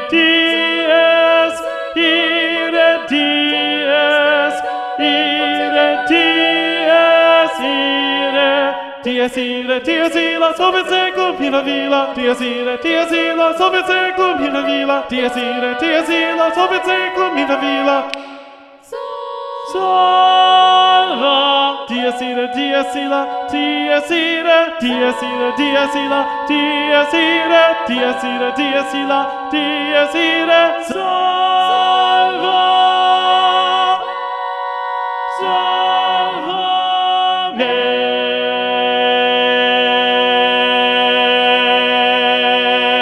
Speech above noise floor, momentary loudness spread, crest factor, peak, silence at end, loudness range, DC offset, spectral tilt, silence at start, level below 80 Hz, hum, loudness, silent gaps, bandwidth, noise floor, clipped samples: 25 dB; 7 LU; 14 dB; 0 dBFS; 0 s; 3 LU; under 0.1%; -3 dB/octave; 0 s; -58 dBFS; none; -14 LUFS; none; 12.5 kHz; -39 dBFS; under 0.1%